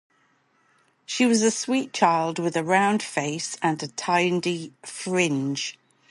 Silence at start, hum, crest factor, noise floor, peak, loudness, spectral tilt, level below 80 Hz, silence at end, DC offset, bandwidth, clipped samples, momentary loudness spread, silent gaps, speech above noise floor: 1.1 s; none; 20 dB; -65 dBFS; -6 dBFS; -24 LUFS; -4 dB/octave; -74 dBFS; 0.4 s; under 0.1%; 11.5 kHz; under 0.1%; 10 LU; none; 41 dB